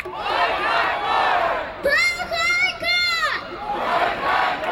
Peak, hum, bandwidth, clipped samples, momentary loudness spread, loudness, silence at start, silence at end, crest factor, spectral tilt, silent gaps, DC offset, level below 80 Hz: -8 dBFS; none; 17.5 kHz; under 0.1%; 6 LU; -20 LUFS; 0 s; 0 s; 14 dB; -2 dB/octave; none; under 0.1%; -48 dBFS